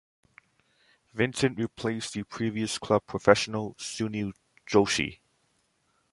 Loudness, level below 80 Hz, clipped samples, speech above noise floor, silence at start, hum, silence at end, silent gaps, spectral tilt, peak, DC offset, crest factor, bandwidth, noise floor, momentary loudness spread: -28 LUFS; -58 dBFS; under 0.1%; 44 dB; 1.15 s; none; 1 s; none; -4.5 dB/octave; -2 dBFS; under 0.1%; 26 dB; 11.5 kHz; -72 dBFS; 12 LU